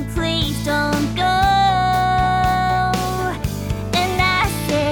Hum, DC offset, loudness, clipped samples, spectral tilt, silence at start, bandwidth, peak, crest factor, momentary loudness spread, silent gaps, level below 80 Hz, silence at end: none; under 0.1%; -18 LUFS; under 0.1%; -4.5 dB/octave; 0 s; 20 kHz; -4 dBFS; 14 dB; 7 LU; none; -30 dBFS; 0 s